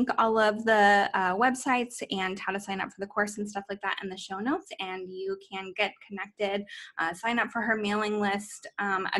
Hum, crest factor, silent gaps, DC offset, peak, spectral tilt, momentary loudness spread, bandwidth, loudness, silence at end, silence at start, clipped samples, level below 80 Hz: none; 18 dB; none; under 0.1%; -10 dBFS; -4 dB/octave; 12 LU; 12.5 kHz; -28 LUFS; 0 s; 0 s; under 0.1%; -68 dBFS